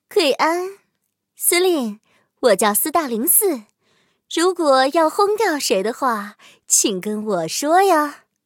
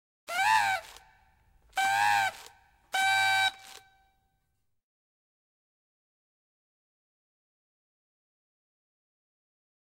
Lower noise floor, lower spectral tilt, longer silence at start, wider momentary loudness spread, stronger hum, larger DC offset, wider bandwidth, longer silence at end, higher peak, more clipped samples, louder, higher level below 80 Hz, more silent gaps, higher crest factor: second, -73 dBFS vs -79 dBFS; first, -2 dB/octave vs 0.5 dB/octave; second, 0.1 s vs 0.3 s; about the same, 10 LU vs 12 LU; neither; neither; about the same, 17 kHz vs 16 kHz; second, 0.3 s vs 6.2 s; first, -2 dBFS vs -12 dBFS; neither; first, -17 LUFS vs -27 LUFS; about the same, -72 dBFS vs -72 dBFS; neither; about the same, 18 dB vs 20 dB